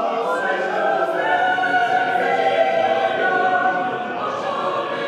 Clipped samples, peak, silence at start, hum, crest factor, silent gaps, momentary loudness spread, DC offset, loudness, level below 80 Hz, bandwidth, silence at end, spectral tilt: under 0.1%; -6 dBFS; 0 s; none; 14 dB; none; 5 LU; under 0.1%; -19 LUFS; -72 dBFS; 11.5 kHz; 0 s; -4.5 dB/octave